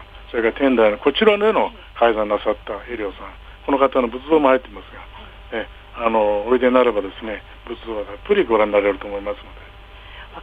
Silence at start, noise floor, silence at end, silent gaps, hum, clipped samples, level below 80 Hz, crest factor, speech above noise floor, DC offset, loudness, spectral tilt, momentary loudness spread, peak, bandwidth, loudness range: 0 s; -40 dBFS; 0 s; none; none; under 0.1%; -42 dBFS; 18 dB; 21 dB; under 0.1%; -19 LUFS; -7 dB/octave; 22 LU; -2 dBFS; 4.9 kHz; 3 LU